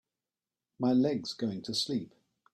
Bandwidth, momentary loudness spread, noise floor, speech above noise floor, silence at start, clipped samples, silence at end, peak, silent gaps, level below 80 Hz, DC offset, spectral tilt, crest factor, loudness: 12.5 kHz; 9 LU; under -90 dBFS; over 59 dB; 0.8 s; under 0.1%; 0.45 s; -18 dBFS; none; -74 dBFS; under 0.1%; -5.5 dB/octave; 16 dB; -32 LUFS